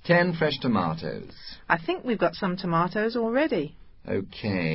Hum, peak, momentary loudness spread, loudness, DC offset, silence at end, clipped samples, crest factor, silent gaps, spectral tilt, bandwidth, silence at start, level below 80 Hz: none; -4 dBFS; 12 LU; -26 LUFS; under 0.1%; 0 s; under 0.1%; 22 dB; none; -10.5 dB/octave; 5.8 kHz; 0.05 s; -54 dBFS